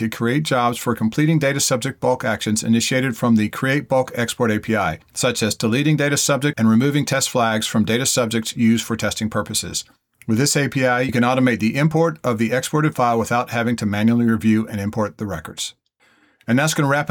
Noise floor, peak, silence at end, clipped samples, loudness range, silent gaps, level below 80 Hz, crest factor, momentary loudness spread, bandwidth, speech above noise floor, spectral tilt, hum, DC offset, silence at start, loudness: -58 dBFS; -6 dBFS; 0 s; under 0.1%; 2 LU; none; -56 dBFS; 12 dB; 6 LU; 19 kHz; 39 dB; -4.5 dB/octave; none; under 0.1%; 0 s; -19 LUFS